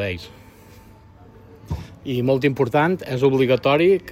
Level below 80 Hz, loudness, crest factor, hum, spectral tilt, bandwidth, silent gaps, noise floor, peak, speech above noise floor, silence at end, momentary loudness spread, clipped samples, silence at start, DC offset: -46 dBFS; -19 LUFS; 16 dB; none; -7.5 dB/octave; 15.5 kHz; none; -46 dBFS; -4 dBFS; 27 dB; 0 s; 16 LU; under 0.1%; 0 s; under 0.1%